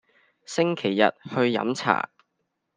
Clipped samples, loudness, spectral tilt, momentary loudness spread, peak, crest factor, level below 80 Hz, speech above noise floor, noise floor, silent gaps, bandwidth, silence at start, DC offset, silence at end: under 0.1%; -24 LUFS; -5 dB/octave; 5 LU; -2 dBFS; 24 dB; -72 dBFS; 54 dB; -77 dBFS; none; 9.8 kHz; 0.5 s; under 0.1%; 0.75 s